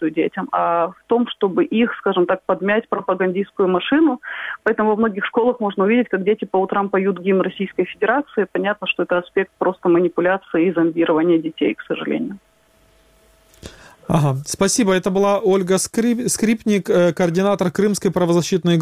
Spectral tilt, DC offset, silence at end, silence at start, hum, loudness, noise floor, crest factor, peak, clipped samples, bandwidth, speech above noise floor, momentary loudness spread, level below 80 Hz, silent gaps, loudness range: -5.5 dB/octave; under 0.1%; 0 s; 0 s; none; -19 LUFS; -56 dBFS; 16 dB; -2 dBFS; under 0.1%; 15.5 kHz; 38 dB; 5 LU; -54 dBFS; none; 4 LU